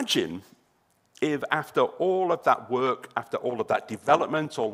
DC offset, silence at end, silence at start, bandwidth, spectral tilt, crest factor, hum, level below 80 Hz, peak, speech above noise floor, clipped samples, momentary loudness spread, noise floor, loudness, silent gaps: under 0.1%; 0 s; 0 s; 16 kHz; -4.5 dB/octave; 20 dB; none; -72 dBFS; -6 dBFS; 42 dB; under 0.1%; 8 LU; -68 dBFS; -26 LUFS; none